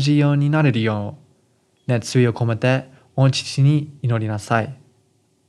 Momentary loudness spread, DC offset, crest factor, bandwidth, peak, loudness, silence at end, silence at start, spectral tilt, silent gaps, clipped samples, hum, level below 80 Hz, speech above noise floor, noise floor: 10 LU; under 0.1%; 18 dB; 11.5 kHz; -2 dBFS; -19 LUFS; 0.75 s; 0 s; -6.5 dB/octave; none; under 0.1%; none; -68 dBFS; 43 dB; -62 dBFS